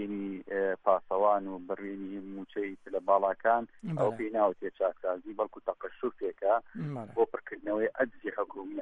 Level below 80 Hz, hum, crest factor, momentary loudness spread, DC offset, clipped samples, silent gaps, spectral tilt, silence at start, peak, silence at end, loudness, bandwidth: -70 dBFS; none; 20 dB; 11 LU; under 0.1%; under 0.1%; none; -8.5 dB/octave; 0 s; -12 dBFS; 0 s; -32 LUFS; 8 kHz